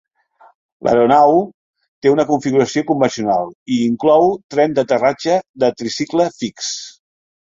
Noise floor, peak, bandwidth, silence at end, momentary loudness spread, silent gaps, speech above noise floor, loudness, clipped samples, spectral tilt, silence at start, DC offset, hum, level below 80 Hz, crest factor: -51 dBFS; -2 dBFS; 7.8 kHz; 0.55 s; 11 LU; 1.54-1.74 s, 1.88-2.02 s, 3.55-3.66 s, 4.44-4.49 s, 5.49-5.54 s; 36 dB; -16 LUFS; under 0.1%; -5 dB/octave; 0.85 s; under 0.1%; none; -58 dBFS; 16 dB